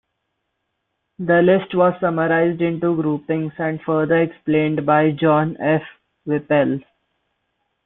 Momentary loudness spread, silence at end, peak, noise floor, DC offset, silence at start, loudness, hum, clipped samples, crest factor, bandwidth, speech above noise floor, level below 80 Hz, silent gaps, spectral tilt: 8 LU; 1.05 s; -2 dBFS; -75 dBFS; under 0.1%; 1.2 s; -19 LUFS; none; under 0.1%; 16 dB; 4 kHz; 57 dB; -60 dBFS; none; -12 dB/octave